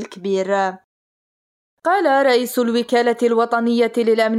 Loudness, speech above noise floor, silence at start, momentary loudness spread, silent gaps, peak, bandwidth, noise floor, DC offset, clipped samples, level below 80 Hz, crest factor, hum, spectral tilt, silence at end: -18 LUFS; over 73 dB; 0 s; 7 LU; 0.84-1.77 s; -6 dBFS; 15.5 kHz; under -90 dBFS; under 0.1%; under 0.1%; -76 dBFS; 12 dB; none; -4.5 dB/octave; 0 s